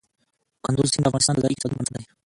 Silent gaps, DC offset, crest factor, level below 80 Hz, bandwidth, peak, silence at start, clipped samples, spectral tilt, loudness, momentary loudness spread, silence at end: none; under 0.1%; 18 dB; -52 dBFS; 11.5 kHz; -6 dBFS; 0.65 s; under 0.1%; -4.5 dB/octave; -23 LUFS; 10 LU; 0.2 s